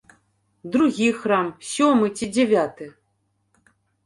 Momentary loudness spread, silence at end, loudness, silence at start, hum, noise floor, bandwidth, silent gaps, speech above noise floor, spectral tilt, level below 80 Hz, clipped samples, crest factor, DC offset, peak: 16 LU; 1.15 s; -21 LUFS; 0.65 s; none; -70 dBFS; 11.5 kHz; none; 49 dB; -4.5 dB/octave; -62 dBFS; under 0.1%; 16 dB; under 0.1%; -6 dBFS